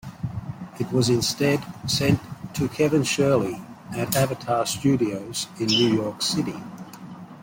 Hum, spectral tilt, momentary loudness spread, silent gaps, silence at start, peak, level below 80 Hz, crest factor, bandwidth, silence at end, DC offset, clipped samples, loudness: none; -4.5 dB/octave; 16 LU; none; 0.05 s; -4 dBFS; -54 dBFS; 20 dB; 16.5 kHz; 0 s; under 0.1%; under 0.1%; -23 LUFS